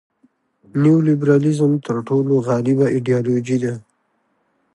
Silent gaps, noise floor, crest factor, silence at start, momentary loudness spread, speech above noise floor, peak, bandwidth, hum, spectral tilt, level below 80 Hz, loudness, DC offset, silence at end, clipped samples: none; -66 dBFS; 14 dB; 0.75 s; 7 LU; 50 dB; -4 dBFS; 11.5 kHz; none; -8.5 dB/octave; -62 dBFS; -17 LUFS; under 0.1%; 0.95 s; under 0.1%